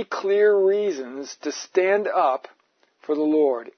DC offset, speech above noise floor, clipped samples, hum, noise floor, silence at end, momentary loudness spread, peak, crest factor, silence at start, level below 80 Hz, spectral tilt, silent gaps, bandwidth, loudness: under 0.1%; 36 dB; under 0.1%; none; -58 dBFS; 0.1 s; 13 LU; -8 dBFS; 14 dB; 0 s; -86 dBFS; -4 dB/octave; none; 6.6 kHz; -22 LUFS